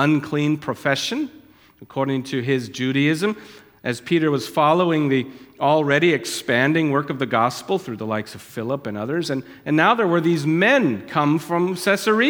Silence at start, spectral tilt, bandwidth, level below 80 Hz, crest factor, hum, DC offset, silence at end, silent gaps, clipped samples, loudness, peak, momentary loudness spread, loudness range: 0 s; -5.5 dB/octave; 18.5 kHz; -66 dBFS; 18 dB; none; under 0.1%; 0 s; none; under 0.1%; -20 LUFS; -2 dBFS; 11 LU; 4 LU